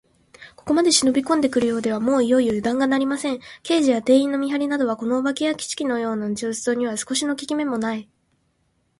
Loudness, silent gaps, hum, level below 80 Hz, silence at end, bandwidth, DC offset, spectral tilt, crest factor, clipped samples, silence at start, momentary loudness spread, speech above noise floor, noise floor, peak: -21 LUFS; none; none; -60 dBFS; 0.95 s; 11.5 kHz; under 0.1%; -3.5 dB/octave; 18 dB; under 0.1%; 0.4 s; 8 LU; 47 dB; -67 dBFS; -4 dBFS